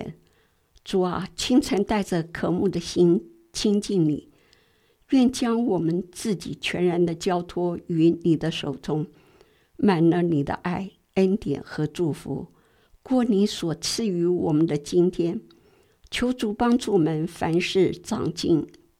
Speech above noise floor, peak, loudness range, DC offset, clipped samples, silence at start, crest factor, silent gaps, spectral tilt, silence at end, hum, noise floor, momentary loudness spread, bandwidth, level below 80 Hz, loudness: 40 dB; -6 dBFS; 2 LU; under 0.1%; under 0.1%; 0 s; 18 dB; none; -6 dB/octave; 0.3 s; none; -63 dBFS; 9 LU; 14.5 kHz; -52 dBFS; -24 LUFS